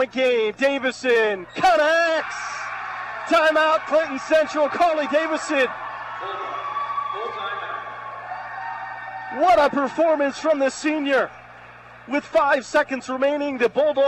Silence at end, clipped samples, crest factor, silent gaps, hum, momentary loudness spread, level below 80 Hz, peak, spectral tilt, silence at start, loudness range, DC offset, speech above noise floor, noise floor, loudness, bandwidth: 0 s; under 0.1%; 12 dB; none; 60 Hz at -60 dBFS; 14 LU; -58 dBFS; -10 dBFS; -3 dB/octave; 0 s; 7 LU; under 0.1%; 23 dB; -43 dBFS; -21 LUFS; 12.5 kHz